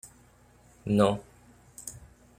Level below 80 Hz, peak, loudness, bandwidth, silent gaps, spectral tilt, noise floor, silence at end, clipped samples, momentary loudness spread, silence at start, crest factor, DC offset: -58 dBFS; -10 dBFS; -27 LUFS; 16 kHz; none; -6 dB/octave; -59 dBFS; 0.4 s; under 0.1%; 26 LU; 0.05 s; 24 dB; under 0.1%